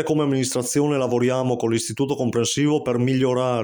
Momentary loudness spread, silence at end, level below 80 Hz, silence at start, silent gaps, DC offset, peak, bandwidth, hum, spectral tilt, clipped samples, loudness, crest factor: 3 LU; 0 s; -58 dBFS; 0 s; none; under 0.1%; -8 dBFS; over 20 kHz; none; -5 dB/octave; under 0.1%; -21 LUFS; 12 dB